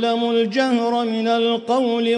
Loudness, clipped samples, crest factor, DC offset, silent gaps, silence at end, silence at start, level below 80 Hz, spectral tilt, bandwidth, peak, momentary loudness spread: -19 LUFS; under 0.1%; 12 dB; under 0.1%; none; 0 s; 0 s; -76 dBFS; -5 dB/octave; 10 kHz; -6 dBFS; 1 LU